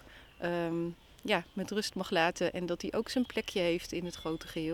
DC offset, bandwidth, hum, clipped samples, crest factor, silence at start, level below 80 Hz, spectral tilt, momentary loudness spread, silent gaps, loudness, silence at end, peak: under 0.1%; 19 kHz; none; under 0.1%; 22 dB; 0 s; -60 dBFS; -4.5 dB/octave; 8 LU; none; -34 LUFS; 0 s; -14 dBFS